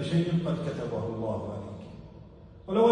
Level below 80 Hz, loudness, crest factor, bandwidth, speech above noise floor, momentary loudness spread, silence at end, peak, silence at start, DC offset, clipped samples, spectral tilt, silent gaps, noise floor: -56 dBFS; -31 LUFS; 20 dB; 10 kHz; 19 dB; 21 LU; 0 s; -10 dBFS; 0 s; under 0.1%; under 0.1%; -8 dB/octave; none; -49 dBFS